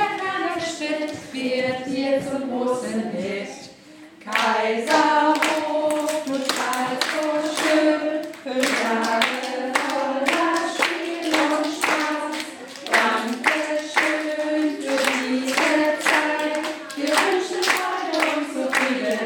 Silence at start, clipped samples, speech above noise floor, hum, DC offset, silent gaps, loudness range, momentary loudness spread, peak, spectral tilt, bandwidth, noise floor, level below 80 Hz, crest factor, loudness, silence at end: 0 s; under 0.1%; 23 dB; none; under 0.1%; none; 4 LU; 8 LU; 0 dBFS; -2.5 dB/octave; 17.5 kHz; -45 dBFS; -70 dBFS; 22 dB; -22 LUFS; 0 s